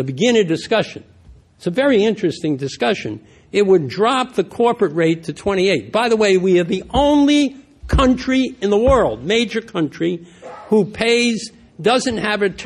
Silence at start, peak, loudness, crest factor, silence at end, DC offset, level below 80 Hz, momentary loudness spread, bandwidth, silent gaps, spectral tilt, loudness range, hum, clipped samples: 0 s; -2 dBFS; -17 LUFS; 14 dB; 0 s; under 0.1%; -34 dBFS; 9 LU; 11.5 kHz; none; -5 dB/octave; 3 LU; none; under 0.1%